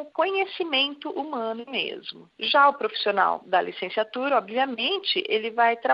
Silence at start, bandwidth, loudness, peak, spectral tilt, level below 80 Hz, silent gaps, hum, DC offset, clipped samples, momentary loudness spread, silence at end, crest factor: 0 s; 5.6 kHz; -24 LUFS; -6 dBFS; -6 dB/octave; -84 dBFS; none; none; under 0.1%; under 0.1%; 10 LU; 0 s; 18 dB